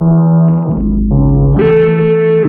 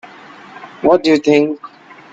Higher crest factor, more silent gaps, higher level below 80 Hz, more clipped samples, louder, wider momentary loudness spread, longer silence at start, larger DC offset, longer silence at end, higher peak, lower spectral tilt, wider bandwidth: second, 8 dB vs 16 dB; neither; first, -20 dBFS vs -56 dBFS; neither; first, -10 LUFS vs -13 LUFS; second, 4 LU vs 22 LU; second, 0 s vs 0.6 s; neither; second, 0 s vs 0.45 s; about the same, 0 dBFS vs 0 dBFS; first, -12.5 dB/octave vs -5.5 dB/octave; second, 3.5 kHz vs 7.8 kHz